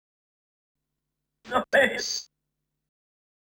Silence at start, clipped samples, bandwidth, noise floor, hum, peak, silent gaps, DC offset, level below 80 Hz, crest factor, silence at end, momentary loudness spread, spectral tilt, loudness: 1.45 s; under 0.1%; 18.5 kHz; -83 dBFS; none; -8 dBFS; none; under 0.1%; -64 dBFS; 22 dB; 1.2 s; 9 LU; -1.5 dB/octave; -25 LUFS